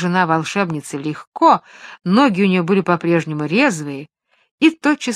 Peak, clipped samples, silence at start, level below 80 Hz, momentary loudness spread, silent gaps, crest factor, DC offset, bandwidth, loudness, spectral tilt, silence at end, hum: 0 dBFS; under 0.1%; 0 s; -66 dBFS; 12 LU; 1.27-1.32 s, 4.51-4.58 s; 16 dB; under 0.1%; 13.5 kHz; -17 LUFS; -6 dB/octave; 0 s; none